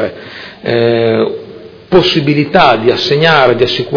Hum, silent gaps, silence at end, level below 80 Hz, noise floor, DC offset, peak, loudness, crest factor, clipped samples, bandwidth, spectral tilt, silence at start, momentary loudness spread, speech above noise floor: none; none; 0 s; -42 dBFS; -32 dBFS; under 0.1%; 0 dBFS; -10 LUFS; 10 dB; 0.7%; 5.4 kHz; -6.5 dB/octave; 0 s; 13 LU; 21 dB